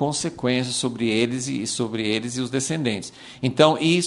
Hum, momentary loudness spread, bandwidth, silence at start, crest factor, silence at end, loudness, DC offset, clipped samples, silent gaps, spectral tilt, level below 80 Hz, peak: none; 9 LU; 11.5 kHz; 0 s; 22 dB; 0 s; -23 LUFS; under 0.1%; under 0.1%; none; -4 dB/octave; -60 dBFS; 0 dBFS